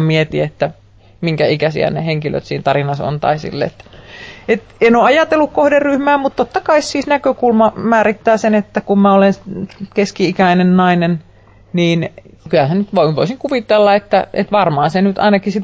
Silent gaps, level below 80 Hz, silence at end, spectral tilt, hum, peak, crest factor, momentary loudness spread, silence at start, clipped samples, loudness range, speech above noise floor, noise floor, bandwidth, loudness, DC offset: none; -46 dBFS; 0 s; -6.5 dB/octave; none; -2 dBFS; 12 dB; 10 LU; 0 s; under 0.1%; 4 LU; 21 dB; -35 dBFS; 8 kHz; -14 LUFS; under 0.1%